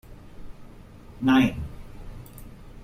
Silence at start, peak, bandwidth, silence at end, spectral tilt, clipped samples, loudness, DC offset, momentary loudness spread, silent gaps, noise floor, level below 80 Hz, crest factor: 0.1 s; -10 dBFS; 16 kHz; 0 s; -6.5 dB/octave; under 0.1%; -23 LUFS; under 0.1%; 26 LU; none; -45 dBFS; -44 dBFS; 18 dB